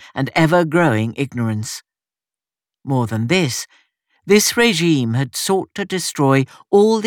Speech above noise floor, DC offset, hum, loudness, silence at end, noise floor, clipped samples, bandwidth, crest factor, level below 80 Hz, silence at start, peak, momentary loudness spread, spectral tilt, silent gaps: over 73 dB; under 0.1%; none; -17 LUFS; 0 s; under -90 dBFS; under 0.1%; 19.5 kHz; 16 dB; -58 dBFS; 0 s; -2 dBFS; 10 LU; -5 dB/octave; none